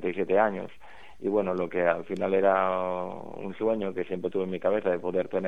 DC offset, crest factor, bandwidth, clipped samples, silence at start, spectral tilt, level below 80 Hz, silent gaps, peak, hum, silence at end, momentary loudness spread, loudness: 0.6%; 18 dB; 7.6 kHz; under 0.1%; 0 s; -8 dB/octave; -64 dBFS; none; -10 dBFS; none; 0 s; 11 LU; -28 LUFS